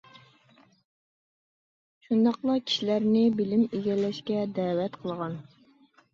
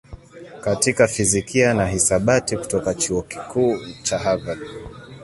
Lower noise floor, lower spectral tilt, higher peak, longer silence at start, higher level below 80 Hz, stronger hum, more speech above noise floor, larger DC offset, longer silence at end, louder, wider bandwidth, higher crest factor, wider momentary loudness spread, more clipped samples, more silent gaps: first, -61 dBFS vs -40 dBFS; first, -6.5 dB/octave vs -4 dB/octave; second, -12 dBFS vs -2 dBFS; first, 2.1 s vs 0.1 s; second, -72 dBFS vs -44 dBFS; neither; first, 35 dB vs 19 dB; neither; first, 0.7 s vs 0 s; second, -27 LUFS vs -20 LUFS; second, 7.4 kHz vs 12 kHz; about the same, 16 dB vs 18 dB; second, 10 LU vs 13 LU; neither; neither